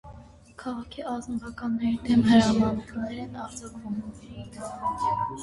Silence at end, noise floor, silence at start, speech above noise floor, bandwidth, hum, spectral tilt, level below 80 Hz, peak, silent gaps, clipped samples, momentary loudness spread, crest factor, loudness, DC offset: 0 s; -48 dBFS; 0.05 s; 21 dB; 11.5 kHz; none; -6 dB/octave; -50 dBFS; -8 dBFS; none; under 0.1%; 19 LU; 18 dB; -27 LUFS; under 0.1%